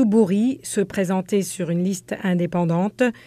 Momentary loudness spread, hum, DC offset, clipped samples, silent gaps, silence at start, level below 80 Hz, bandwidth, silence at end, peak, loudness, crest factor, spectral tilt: 6 LU; none; under 0.1%; under 0.1%; none; 0 s; -60 dBFS; 15.5 kHz; 0.15 s; -6 dBFS; -22 LUFS; 14 dB; -6.5 dB/octave